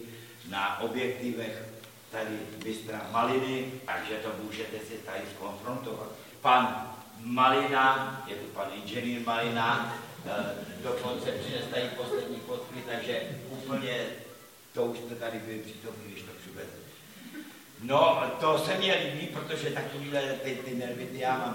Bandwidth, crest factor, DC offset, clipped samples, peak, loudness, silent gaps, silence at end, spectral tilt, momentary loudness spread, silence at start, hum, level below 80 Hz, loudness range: 17 kHz; 24 dB; under 0.1%; under 0.1%; -8 dBFS; -31 LUFS; none; 0 s; -4.5 dB/octave; 19 LU; 0 s; none; -74 dBFS; 9 LU